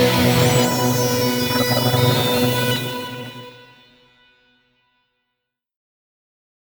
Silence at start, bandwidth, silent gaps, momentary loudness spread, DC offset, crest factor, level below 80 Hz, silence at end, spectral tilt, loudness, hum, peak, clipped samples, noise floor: 0 s; over 20 kHz; none; 15 LU; under 0.1%; 18 dB; -48 dBFS; 3.1 s; -4.5 dB/octave; -17 LUFS; none; -4 dBFS; under 0.1%; -79 dBFS